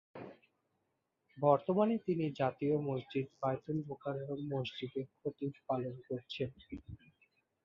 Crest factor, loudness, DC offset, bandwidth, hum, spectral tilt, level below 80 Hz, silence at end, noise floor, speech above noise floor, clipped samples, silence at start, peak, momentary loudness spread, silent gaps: 22 dB; -37 LUFS; under 0.1%; 7.2 kHz; none; -6.5 dB/octave; -68 dBFS; 0.7 s; -83 dBFS; 47 dB; under 0.1%; 0.15 s; -16 dBFS; 19 LU; none